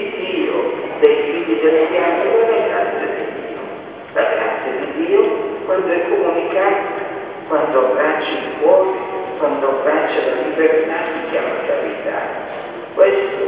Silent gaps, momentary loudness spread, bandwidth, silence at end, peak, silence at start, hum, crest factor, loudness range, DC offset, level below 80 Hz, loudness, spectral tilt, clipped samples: none; 11 LU; 4 kHz; 0 s; 0 dBFS; 0 s; none; 16 dB; 2 LU; under 0.1%; -62 dBFS; -17 LUFS; -8.5 dB/octave; under 0.1%